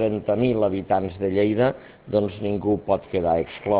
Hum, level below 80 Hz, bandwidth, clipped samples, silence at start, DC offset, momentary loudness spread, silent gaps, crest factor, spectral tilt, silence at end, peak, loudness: none; -46 dBFS; 4 kHz; under 0.1%; 0 s; under 0.1%; 5 LU; none; 16 dB; -11.5 dB/octave; 0 s; -6 dBFS; -23 LUFS